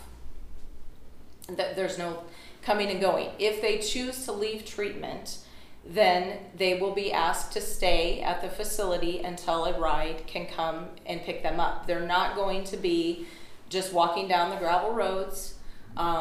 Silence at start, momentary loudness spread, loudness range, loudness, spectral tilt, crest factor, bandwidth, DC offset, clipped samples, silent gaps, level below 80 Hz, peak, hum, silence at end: 0 s; 12 LU; 3 LU; -29 LUFS; -3.5 dB/octave; 18 dB; 15.5 kHz; under 0.1%; under 0.1%; none; -40 dBFS; -10 dBFS; none; 0 s